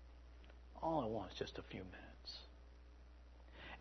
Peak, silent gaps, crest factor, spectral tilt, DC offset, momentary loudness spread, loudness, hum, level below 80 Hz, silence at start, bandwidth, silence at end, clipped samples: -28 dBFS; none; 22 dB; -4.5 dB/octave; under 0.1%; 21 LU; -47 LUFS; none; -60 dBFS; 0 s; 6.2 kHz; 0 s; under 0.1%